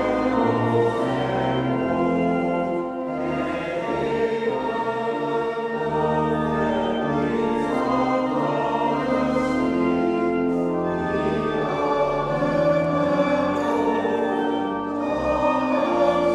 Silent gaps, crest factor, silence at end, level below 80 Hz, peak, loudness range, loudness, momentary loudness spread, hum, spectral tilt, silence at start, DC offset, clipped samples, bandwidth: none; 16 dB; 0 s; -48 dBFS; -6 dBFS; 2 LU; -23 LUFS; 5 LU; none; -7 dB/octave; 0 s; under 0.1%; under 0.1%; 11 kHz